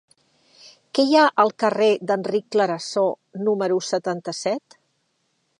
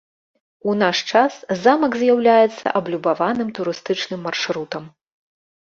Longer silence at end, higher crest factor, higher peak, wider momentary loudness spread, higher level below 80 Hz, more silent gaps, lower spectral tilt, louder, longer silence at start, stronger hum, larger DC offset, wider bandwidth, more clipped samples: first, 1 s vs 0.85 s; about the same, 20 dB vs 18 dB; about the same, -4 dBFS vs -2 dBFS; about the same, 10 LU vs 11 LU; second, -78 dBFS vs -64 dBFS; neither; about the same, -4.5 dB/octave vs -4.5 dB/octave; about the same, -21 LUFS vs -19 LUFS; first, 0.95 s vs 0.65 s; neither; neither; first, 11 kHz vs 7.4 kHz; neither